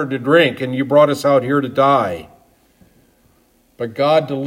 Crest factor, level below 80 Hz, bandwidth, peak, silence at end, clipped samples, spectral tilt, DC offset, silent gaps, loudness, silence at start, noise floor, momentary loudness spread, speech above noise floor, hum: 16 dB; -60 dBFS; 16 kHz; 0 dBFS; 0 s; under 0.1%; -6 dB/octave; under 0.1%; none; -15 LUFS; 0 s; -56 dBFS; 12 LU; 41 dB; none